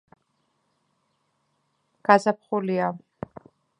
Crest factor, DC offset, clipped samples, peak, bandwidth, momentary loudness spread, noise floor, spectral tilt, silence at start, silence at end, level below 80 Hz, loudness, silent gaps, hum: 26 dB; under 0.1%; under 0.1%; -2 dBFS; 11 kHz; 21 LU; -72 dBFS; -6.5 dB/octave; 2.1 s; 0.85 s; -68 dBFS; -23 LUFS; none; none